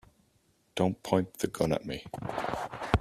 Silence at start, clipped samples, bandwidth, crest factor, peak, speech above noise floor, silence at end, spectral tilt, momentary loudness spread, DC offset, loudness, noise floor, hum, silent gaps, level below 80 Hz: 0.75 s; under 0.1%; 15 kHz; 28 dB; -4 dBFS; 38 dB; 0 s; -6 dB/octave; 9 LU; under 0.1%; -32 LUFS; -69 dBFS; none; none; -48 dBFS